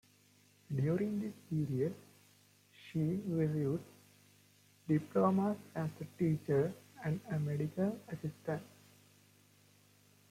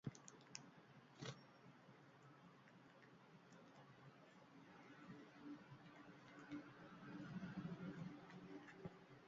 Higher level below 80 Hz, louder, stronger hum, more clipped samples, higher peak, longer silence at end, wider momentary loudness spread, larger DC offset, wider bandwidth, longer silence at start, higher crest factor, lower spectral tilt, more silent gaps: first, -72 dBFS vs -84 dBFS; first, -37 LUFS vs -59 LUFS; first, 50 Hz at -55 dBFS vs none; neither; first, -20 dBFS vs -30 dBFS; first, 1.65 s vs 0 s; second, 11 LU vs 14 LU; neither; first, 15.5 kHz vs 7.4 kHz; first, 0.7 s vs 0.05 s; second, 18 dB vs 28 dB; first, -8.5 dB/octave vs -5.5 dB/octave; neither